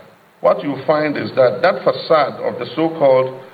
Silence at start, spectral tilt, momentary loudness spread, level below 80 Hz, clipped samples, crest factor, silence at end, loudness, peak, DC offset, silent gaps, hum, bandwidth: 0.45 s; -8 dB/octave; 6 LU; -64 dBFS; under 0.1%; 16 dB; 0.05 s; -17 LUFS; -2 dBFS; under 0.1%; none; none; 5 kHz